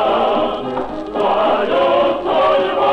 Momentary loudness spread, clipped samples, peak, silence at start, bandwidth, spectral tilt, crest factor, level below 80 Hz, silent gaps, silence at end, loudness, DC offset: 8 LU; under 0.1%; -4 dBFS; 0 s; 8.4 kHz; -6 dB/octave; 12 dB; -46 dBFS; none; 0 s; -16 LUFS; under 0.1%